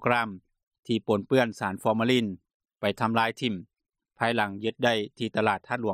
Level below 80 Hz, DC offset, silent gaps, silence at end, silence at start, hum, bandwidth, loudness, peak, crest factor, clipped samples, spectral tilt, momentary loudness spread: -68 dBFS; under 0.1%; 0.67-0.71 s, 0.79-0.83 s, 2.54-2.60 s; 0 s; 0 s; none; 14.5 kHz; -27 LUFS; -8 dBFS; 20 dB; under 0.1%; -5.5 dB/octave; 8 LU